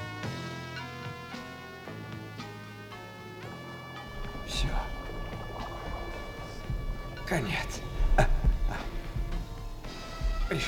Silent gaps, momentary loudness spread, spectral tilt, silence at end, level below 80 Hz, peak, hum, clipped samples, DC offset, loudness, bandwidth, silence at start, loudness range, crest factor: none; 12 LU; -5 dB/octave; 0 s; -34 dBFS; -10 dBFS; none; under 0.1%; under 0.1%; -36 LUFS; 16.5 kHz; 0 s; 9 LU; 22 dB